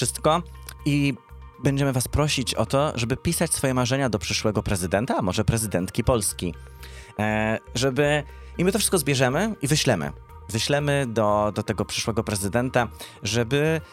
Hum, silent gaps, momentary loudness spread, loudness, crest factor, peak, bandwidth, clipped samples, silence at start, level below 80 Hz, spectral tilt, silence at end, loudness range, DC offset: none; none; 9 LU; -24 LUFS; 18 dB; -6 dBFS; 16.5 kHz; under 0.1%; 0 s; -42 dBFS; -4.5 dB/octave; 0.05 s; 2 LU; under 0.1%